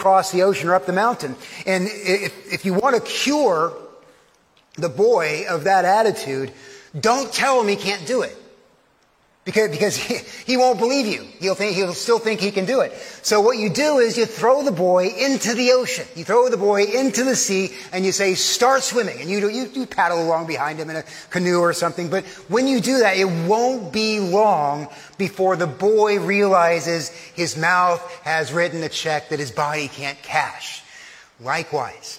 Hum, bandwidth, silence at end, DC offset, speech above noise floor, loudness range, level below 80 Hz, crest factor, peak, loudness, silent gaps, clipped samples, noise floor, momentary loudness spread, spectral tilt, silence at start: none; 16.5 kHz; 0 s; under 0.1%; 40 dB; 4 LU; -66 dBFS; 18 dB; -2 dBFS; -20 LUFS; none; under 0.1%; -59 dBFS; 10 LU; -3.5 dB/octave; 0 s